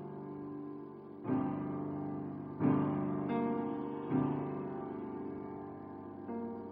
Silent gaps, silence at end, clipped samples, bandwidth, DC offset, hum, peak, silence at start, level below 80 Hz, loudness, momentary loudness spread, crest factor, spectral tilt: none; 0 s; under 0.1%; 4 kHz; under 0.1%; none; -20 dBFS; 0 s; -72 dBFS; -38 LUFS; 13 LU; 18 dB; -11.5 dB/octave